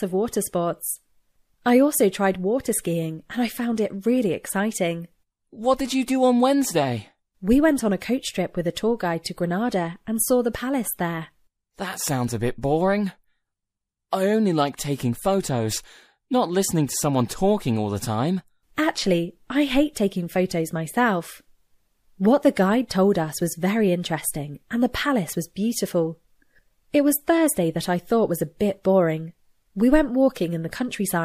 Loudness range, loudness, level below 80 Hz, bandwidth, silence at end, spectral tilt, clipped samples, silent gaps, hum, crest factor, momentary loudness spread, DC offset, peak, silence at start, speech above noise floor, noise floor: 3 LU; -23 LUFS; -46 dBFS; 15.5 kHz; 0 s; -5 dB/octave; under 0.1%; none; none; 20 dB; 9 LU; under 0.1%; -4 dBFS; 0 s; 62 dB; -84 dBFS